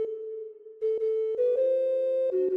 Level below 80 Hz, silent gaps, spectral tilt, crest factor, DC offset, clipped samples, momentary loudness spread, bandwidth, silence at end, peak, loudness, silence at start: -76 dBFS; none; -6.5 dB/octave; 10 dB; under 0.1%; under 0.1%; 13 LU; 3.9 kHz; 0 s; -18 dBFS; -27 LUFS; 0 s